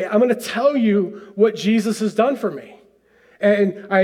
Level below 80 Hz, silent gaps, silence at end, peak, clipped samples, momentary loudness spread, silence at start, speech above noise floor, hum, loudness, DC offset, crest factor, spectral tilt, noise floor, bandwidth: -70 dBFS; none; 0 s; -4 dBFS; under 0.1%; 8 LU; 0 s; 36 dB; none; -19 LUFS; under 0.1%; 16 dB; -6 dB/octave; -54 dBFS; 15 kHz